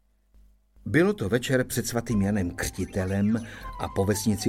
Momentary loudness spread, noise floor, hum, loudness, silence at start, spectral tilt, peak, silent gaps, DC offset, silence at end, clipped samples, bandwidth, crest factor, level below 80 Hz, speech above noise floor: 8 LU; -58 dBFS; none; -26 LUFS; 0.85 s; -5.5 dB/octave; -8 dBFS; none; under 0.1%; 0 s; under 0.1%; 16.5 kHz; 18 dB; -46 dBFS; 32 dB